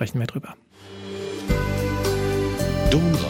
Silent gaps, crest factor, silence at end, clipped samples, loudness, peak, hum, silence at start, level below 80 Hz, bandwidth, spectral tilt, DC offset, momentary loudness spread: none; 16 dB; 0 s; under 0.1%; -24 LUFS; -8 dBFS; none; 0 s; -32 dBFS; 17 kHz; -6 dB/octave; under 0.1%; 16 LU